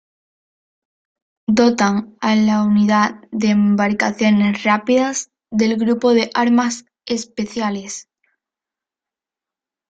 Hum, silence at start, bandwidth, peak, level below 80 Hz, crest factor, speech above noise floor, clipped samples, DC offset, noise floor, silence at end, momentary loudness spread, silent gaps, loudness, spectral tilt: none; 1.5 s; 8 kHz; -2 dBFS; -58 dBFS; 16 dB; 72 dB; under 0.1%; under 0.1%; -88 dBFS; 1.9 s; 10 LU; none; -17 LUFS; -5 dB/octave